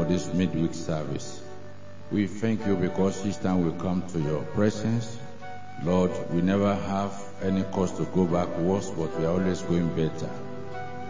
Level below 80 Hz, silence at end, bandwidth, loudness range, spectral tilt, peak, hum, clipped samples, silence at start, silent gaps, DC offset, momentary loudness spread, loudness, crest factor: -48 dBFS; 0 s; 7.6 kHz; 2 LU; -7 dB/octave; -10 dBFS; none; under 0.1%; 0 s; none; 2%; 13 LU; -27 LUFS; 16 dB